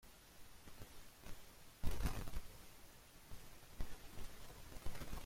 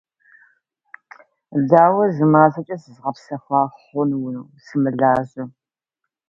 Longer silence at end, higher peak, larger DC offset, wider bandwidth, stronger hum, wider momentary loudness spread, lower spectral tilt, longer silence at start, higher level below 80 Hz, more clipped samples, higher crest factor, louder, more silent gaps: second, 0 s vs 0.8 s; second, -26 dBFS vs 0 dBFS; neither; first, 16.5 kHz vs 7.4 kHz; neither; second, 15 LU vs 18 LU; second, -4.5 dB/octave vs -10 dB/octave; second, 0.05 s vs 1.5 s; first, -50 dBFS vs -62 dBFS; neither; about the same, 20 dB vs 20 dB; second, -54 LUFS vs -18 LUFS; neither